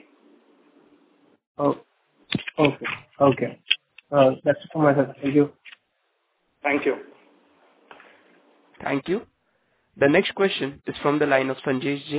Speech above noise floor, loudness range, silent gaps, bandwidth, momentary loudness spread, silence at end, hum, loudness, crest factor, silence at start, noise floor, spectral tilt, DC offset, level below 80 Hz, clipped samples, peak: 50 dB; 8 LU; none; 4 kHz; 10 LU; 0 s; none; -23 LUFS; 22 dB; 1.6 s; -72 dBFS; -10 dB/octave; under 0.1%; -62 dBFS; under 0.1%; -2 dBFS